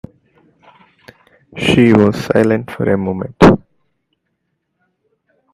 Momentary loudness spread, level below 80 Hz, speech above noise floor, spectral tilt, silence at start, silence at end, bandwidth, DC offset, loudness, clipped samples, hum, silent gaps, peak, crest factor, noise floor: 10 LU; -40 dBFS; 57 dB; -7 dB/octave; 1.55 s; 1.95 s; 13.5 kHz; under 0.1%; -13 LUFS; under 0.1%; none; none; 0 dBFS; 16 dB; -70 dBFS